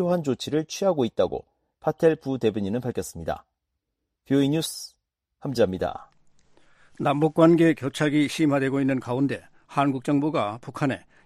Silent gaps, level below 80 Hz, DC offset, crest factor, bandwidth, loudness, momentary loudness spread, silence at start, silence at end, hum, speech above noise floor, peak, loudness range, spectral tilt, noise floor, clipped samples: none; -58 dBFS; under 0.1%; 20 dB; 15 kHz; -24 LUFS; 11 LU; 0 s; 0.25 s; none; 57 dB; -6 dBFS; 6 LU; -6 dB/octave; -81 dBFS; under 0.1%